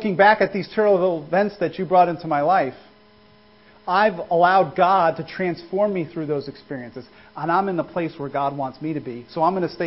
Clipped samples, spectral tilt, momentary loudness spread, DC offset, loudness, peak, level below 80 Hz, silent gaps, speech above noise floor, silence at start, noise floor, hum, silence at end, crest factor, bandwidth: under 0.1%; -10.5 dB/octave; 14 LU; under 0.1%; -21 LUFS; -2 dBFS; -60 dBFS; none; 32 dB; 0 s; -52 dBFS; none; 0 s; 20 dB; 5.8 kHz